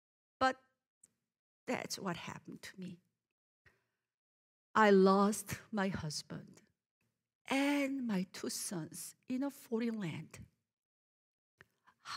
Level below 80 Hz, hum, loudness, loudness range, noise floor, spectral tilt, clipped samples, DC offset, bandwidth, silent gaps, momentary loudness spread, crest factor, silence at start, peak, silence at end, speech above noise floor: -74 dBFS; none; -35 LUFS; 12 LU; -81 dBFS; -5 dB/octave; under 0.1%; under 0.1%; 16 kHz; 0.86-1.01 s, 1.39-1.67 s, 3.32-3.65 s, 4.14-4.74 s, 6.86-7.01 s, 7.35-7.45 s, 10.73-11.58 s; 21 LU; 24 dB; 0.4 s; -14 dBFS; 0 s; 45 dB